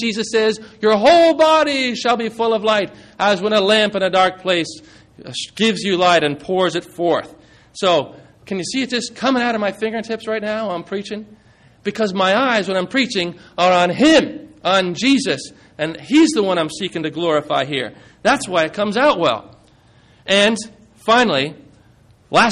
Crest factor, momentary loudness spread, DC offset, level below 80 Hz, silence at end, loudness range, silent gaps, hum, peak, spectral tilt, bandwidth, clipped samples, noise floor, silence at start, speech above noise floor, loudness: 14 dB; 13 LU; under 0.1%; -56 dBFS; 0 s; 5 LU; none; none; -2 dBFS; -4 dB/octave; 12 kHz; under 0.1%; -51 dBFS; 0 s; 34 dB; -17 LUFS